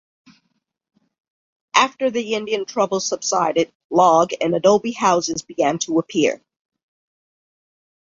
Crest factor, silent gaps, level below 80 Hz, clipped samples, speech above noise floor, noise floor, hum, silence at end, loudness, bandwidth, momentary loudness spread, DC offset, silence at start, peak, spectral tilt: 20 dB; 3.75-3.90 s; -64 dBFS; under 0.1%; 53 dB; -72 dBFS; none; 1.75 s; -19 LUFS; 7.8 kHz; 7 LU; under 0.1%; 1.75 s; -2 dBFS; -3.5 dB/octave